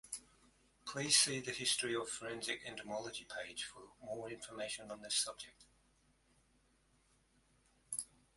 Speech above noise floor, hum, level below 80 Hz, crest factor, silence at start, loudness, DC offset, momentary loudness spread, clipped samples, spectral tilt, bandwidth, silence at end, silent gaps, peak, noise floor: 33 dB; none; -76 dBFS; 28 dB; 0.05 s; -39 LUFS; under 0.1%; 18 LU; under 0.1%; -1 dB/octave; 12 kHz; 0.3 s; none; -16 dBFS; -74 dBFS